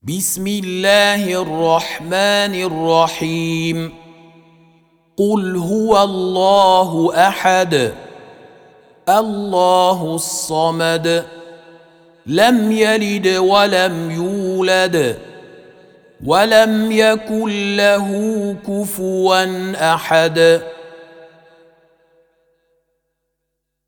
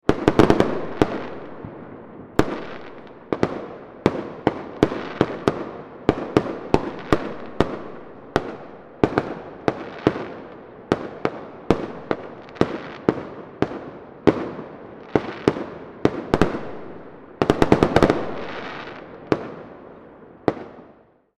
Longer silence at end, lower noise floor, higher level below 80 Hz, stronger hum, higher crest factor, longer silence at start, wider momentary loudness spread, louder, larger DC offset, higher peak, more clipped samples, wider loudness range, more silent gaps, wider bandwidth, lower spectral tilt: first, 2.85 s vs 0.5 s; first, -75 dBFS vs -53 dBFS; second, -54 dBFS vs -44 dBFS; neither; second, 16 dB vs 24 dB; about the same, 0.05 s vs 0.05 s; second, 9 LU vs 19 LU; first, -15 LUFS vs -24 LUFS; neither; about the same, 0 dBFS vs 0 dBFS; neither; about the same, 4 LU vs 5 LU; neither; first, over 20 kHz vs 12.5 kHz; second, -4 dB/octave vs -7 dB/octave